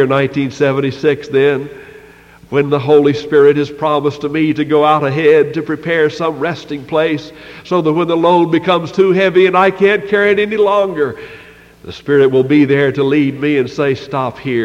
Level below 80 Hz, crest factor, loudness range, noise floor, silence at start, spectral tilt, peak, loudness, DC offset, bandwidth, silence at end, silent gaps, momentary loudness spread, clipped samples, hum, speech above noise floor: -52 dBFS; 12 dB; 3 LU; -40 dBFS; 0 s; -7 dB/octave; 0 dBFS; -13 LUFS; under 0.1%; 8.2 kHz; 0 s; none; 9 LU; under 0.1%; none; 28 dB